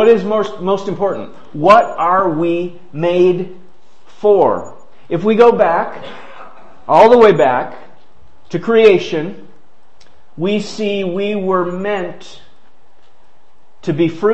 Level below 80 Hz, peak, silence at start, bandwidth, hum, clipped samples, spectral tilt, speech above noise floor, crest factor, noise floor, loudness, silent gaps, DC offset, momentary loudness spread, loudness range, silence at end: -54 dBFS; 0 dBFS; 0 s; 8.4 kHz; none; 0.1%; -6.5 dB/octave; 41 dB; 16 dB; -55 dBFS; -14 LUFS; none; 3%; 17 LU; 8 LU; 0 s